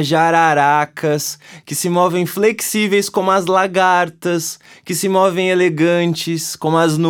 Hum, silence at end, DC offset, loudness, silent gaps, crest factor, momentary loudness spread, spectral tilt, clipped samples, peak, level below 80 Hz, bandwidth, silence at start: none; 0 s; under 0.1%; -16 LUFS; none; 16 dB; 8 LU; -4.5 dB/octave; under 0.1%; 0 dBFS; -68 dBFS; 19 kHz; 0 s